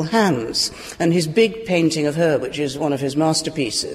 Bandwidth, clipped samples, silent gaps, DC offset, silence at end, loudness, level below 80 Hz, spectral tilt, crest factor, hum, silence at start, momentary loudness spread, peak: 15.5 kHz; under 0.1%; none; under 0.1%; 0 s; -19 LUFS; -52 dBFS; -4.5 dB/octave; 16 dB; none; 0 s; 4 LU; -4 dBFS